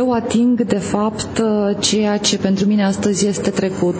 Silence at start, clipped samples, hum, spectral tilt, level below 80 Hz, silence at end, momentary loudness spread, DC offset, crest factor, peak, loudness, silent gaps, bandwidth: 0 s; under 0.1%; none; -4.5 dB/octave; -46 dBFS; 0 s; 4 LU; under 0.1%; 14 dB; -2 dBFS; -17 LUFS; none; 8 kHz